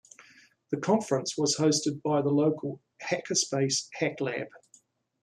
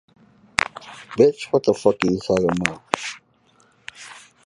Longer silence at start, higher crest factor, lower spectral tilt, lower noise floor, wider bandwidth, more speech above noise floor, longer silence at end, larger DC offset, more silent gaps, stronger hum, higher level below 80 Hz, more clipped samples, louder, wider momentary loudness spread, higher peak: about the same, 0.7 s vs 0.6 s; about the same, 18 dB vs 22 dB; about the same, -4 dB/octave vs -5 dB/octave; first, -63 dBFS vs -59 dBFS; first, 13 kHz vs 11.5 kHz; second, 35 dB vs 39 dB; first, 0.65 s vs 0.3 s; neither; neither; neither; second, -74 dBFS vs -54 dBFS; neither; second, -28 LUFS vs -21 LUFS; second, 11 LU vs 22 LU; second, -12 dBFS vs 0 dBFS